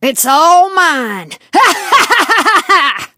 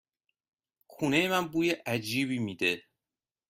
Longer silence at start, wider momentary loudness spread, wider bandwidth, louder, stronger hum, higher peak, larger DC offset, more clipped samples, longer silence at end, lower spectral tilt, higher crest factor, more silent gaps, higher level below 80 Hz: second, 0 s vs 0.9 s; about the same, 8 LU vs 6 LU; about the same, 17 kHz vs 16 kHz; first, -9 LUFS vs -29 LUFS; neither; first, 0 dBFS vs -12 dBFS; neither; first, 0.2% vs under 0.1%; second, 0.1 s vs 0.7 s; second, -1 dB/octave vs -4.5 dB/octave; second, 10 dB vs 20 dB; neither; first, -62 dBFS vs -70 dBFS